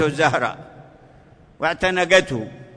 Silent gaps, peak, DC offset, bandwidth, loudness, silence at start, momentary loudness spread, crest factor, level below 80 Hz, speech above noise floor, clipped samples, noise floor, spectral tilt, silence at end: none; -2 dBFS; under 0.1%; 10.5 kHz; -19 LUFS; 0 s; 13 LU; 20 dB; -50 dBFS; 29 dB; under 0.1%; -49 dBFS; -4 dB/octave; 0.1 s